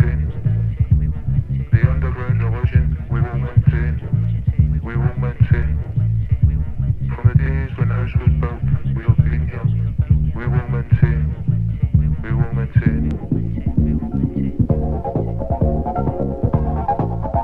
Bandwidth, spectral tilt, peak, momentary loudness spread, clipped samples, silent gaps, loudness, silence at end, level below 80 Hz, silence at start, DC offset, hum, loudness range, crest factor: 3.8 kHz; -11.5 dB/octave; 0 dBFS; 5 LU; under 0.1%; none; -19 LUFS; 0 s; -24 dBFS; 0 s; under 0.1%; none; 2 LU; 16 dB